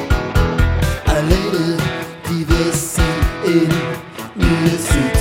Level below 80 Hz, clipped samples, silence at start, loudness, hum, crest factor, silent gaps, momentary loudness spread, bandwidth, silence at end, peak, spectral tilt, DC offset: -22 dBFS; under 0.1%; 0 s; -17 LUFS; none; 16 dB; none; 7 LU; 16.5 kHz; 0 s; 0 dBFS; -5.5 dB/octave; under 0.1%